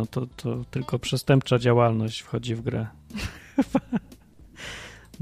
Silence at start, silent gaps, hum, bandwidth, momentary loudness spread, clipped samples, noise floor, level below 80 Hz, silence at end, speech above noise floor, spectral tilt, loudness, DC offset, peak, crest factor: 0 s; none; none; 15 kHz; 17 LU; under 0.1%; -50 dBFS; -50 dBFS; 0.05 s; 25 dB; -6.5 dB/octave; -26 LUFS; under 0.1%; -6 dBFS; 20 dB